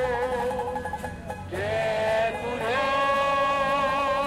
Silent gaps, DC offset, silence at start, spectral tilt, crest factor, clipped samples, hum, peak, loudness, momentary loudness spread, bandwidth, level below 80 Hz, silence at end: none; under 0.1%; 0 s; -4.5 dB/octave; 12 dB; under 0.1%; none; -14 dBFS; -26 LUFS; 11 LU; 16.5 kHz; -48 dBFS; 0 s